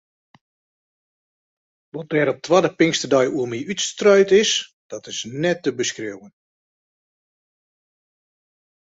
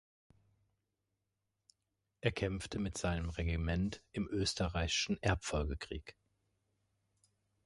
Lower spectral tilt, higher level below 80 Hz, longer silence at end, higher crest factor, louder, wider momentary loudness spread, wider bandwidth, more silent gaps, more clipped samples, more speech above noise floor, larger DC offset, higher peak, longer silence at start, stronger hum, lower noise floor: about the same, -3.5 dB/octave vs -4.5 dB/octave; second, -64 dBFS vs -48 dBFS; first, 2.55 s vs 1.55 s; about the same, 20 dB vs 24 dB; first, -19 LUFS vs -37 LUFS; first, 18 LU vs 8 LU; second, 8 kHz vs 11.5 kHz; first, 4.73-4.90 s vs none; neither; first, over 71 dB vs 50 dB; neither; first, -2 dBFS vs -16 dBFS; second, 1.95 s vs 2.25 s; neither; about the same, under -90 dBFS vs -87 dBFS